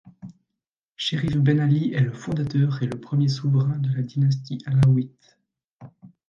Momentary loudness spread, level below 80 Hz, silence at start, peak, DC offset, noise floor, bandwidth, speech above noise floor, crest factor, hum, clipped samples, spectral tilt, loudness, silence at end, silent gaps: 8 LU; -52 dBFS; 0.05 s; -8 dBFS; under 0.1%; -85 dBFS; 7.4 kHz; 63 dB; 16 dB; none; under 0.1%; -7.5 dB/octave; -23 LUFS; 0.2 s; 0.73-0.96 s, 5.71-5.77 s